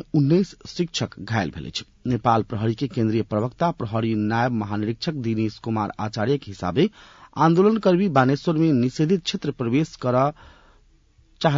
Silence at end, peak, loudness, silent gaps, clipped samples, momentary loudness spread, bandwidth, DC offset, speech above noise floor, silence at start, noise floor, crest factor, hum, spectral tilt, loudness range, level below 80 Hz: 0 s; -6 dBFS; -23 LUFS; none; under 0.1%; 8 LU; 7.6 kHz; under 0.1%; 35 dB; 0.15 s; -57 dBFS; 18 dB; none; -7 dB/octave; 4 LU; -54 dBFS